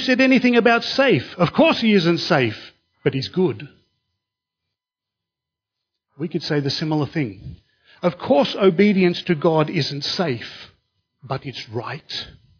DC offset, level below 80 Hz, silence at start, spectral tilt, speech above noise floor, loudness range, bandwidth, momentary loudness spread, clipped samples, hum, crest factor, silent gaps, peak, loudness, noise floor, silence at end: under 0.1%; -58 dBFS; 0 s; -6.5 dB/octave; 67 dB; 10 LU; 5.4 kHz; 15 LU; under 0.1%; none; 20 dB; none; -2 dBFS; -19 LUFS; -86 dBFS; 0.3 s